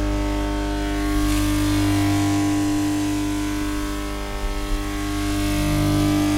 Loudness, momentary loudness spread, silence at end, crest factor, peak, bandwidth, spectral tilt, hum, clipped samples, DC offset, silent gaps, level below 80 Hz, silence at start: -22 LUFS; 8 LU; 0 s; 14 dB; -8 dBFS; 16 kHz; -5.5 dB/octave; 50 Hz at -30 dBFS; under 0.1%; under 0.1%; none; -28 dBFS; 0 s